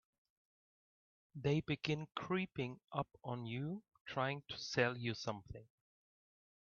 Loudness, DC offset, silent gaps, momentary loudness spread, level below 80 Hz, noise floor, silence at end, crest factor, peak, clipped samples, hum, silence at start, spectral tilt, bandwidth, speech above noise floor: -41 LUFS; under 0.1%; 4.01-4.05 s; 11 LU; -70 dBFS; under -90 dBFS; 1.1 s; 24 dB; -20 dBFS; under 0.1%; none; 1.35 s; -4.5 dB/octave; 7 kHz; over 49 dB